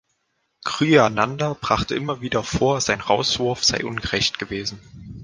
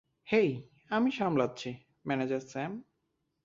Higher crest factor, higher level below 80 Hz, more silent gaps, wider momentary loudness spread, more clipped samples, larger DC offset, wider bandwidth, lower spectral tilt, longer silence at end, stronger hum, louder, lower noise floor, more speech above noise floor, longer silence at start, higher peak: about the same, 22 dB vs 20 dB; first, -44 dBFS vs -72 dBFS; neither; about the same, 12 LU vs 14 LU; neither; neither; first, 10.5 kHz vs 7.6 kHz; second, -4 dB/octave vs -6.5 dB/octave; second, 0 s vs 0.65 s; neither; first, -21 LUFS vs -32 LUFS; second, -72 dBFS vs -80 dBFS; about the same, 50 dB vs 49 dB; first, 0.65 s vs 0.25 s; first, 0 dBFS vs -12 dBFS